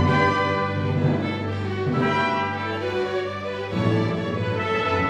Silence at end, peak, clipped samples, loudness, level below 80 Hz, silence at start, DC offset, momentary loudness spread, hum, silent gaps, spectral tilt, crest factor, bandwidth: 0 s; -8 dBFS; under 0.1%; -24 LUFS; -52 dBFS; 0 s; under 0.1%; 7 LU; 50 Hz at -40 dBFS; none; -7 dB/octave; 16 dB; 9.4 kHz